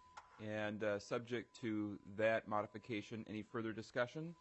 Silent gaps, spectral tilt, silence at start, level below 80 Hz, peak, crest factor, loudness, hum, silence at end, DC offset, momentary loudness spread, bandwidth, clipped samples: none; -6 dB/octave; 0 s; -82 dBFS; -26 dBFS; 18 dB; -43 LUFS; none; 0.05 s; under 0.1%; 9 LU; 8.2 kHz; under 0.1%